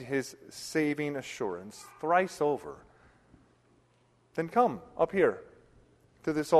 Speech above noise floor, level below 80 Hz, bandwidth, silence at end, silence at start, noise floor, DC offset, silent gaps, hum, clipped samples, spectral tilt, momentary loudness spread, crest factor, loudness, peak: 37 dB; -68 dBFS; 13 kHz; 0 s; 0 s; -67 dBFS; under 0.1%; none; none; under 0.1%; -5.5 dB/octave; 16 LU; 22 dB; -31 LUFS; -10 dBFS